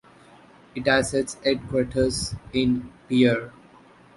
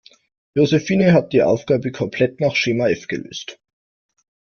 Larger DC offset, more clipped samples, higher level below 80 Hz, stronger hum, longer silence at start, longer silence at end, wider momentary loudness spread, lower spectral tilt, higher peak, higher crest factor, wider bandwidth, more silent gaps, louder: neither; neither; first, -46 dBFS vs -56 dBFS; neither; first, 0.75 s vs 0.55 s; second, 0.65 s vs 1.05 s; second, 8 LU vs 13 LU; about the same, -5 dB/octave vs -6 dB/octave; second, -6 dBFS vs -2 dBFS; about the same, 20 dB vs 16 dB; first, 11.5 kHz vs 7 kHz; neither; second, -24 LUFS vs -18 LUFS